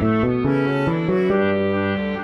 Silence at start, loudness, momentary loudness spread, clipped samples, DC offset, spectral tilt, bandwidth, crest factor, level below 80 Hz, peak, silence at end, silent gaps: 0 s; -20 LUFS; 2 LU; under 0.1%; under 0.1%; -9 dB/octave; 6.6 kHz; 12 dB; -44 dBFS; -6 dBFS; 0 s; none